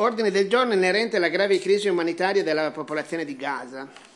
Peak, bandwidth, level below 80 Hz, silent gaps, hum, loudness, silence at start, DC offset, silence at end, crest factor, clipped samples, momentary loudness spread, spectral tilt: -8 dBFS; 11.5 kHz; -84 dBFS; none; none; -23 LUFS; 0 s; under 0.1%; 0.15 s; 16 dB; under 0.1%; 10 LU; -4.5 dB/octave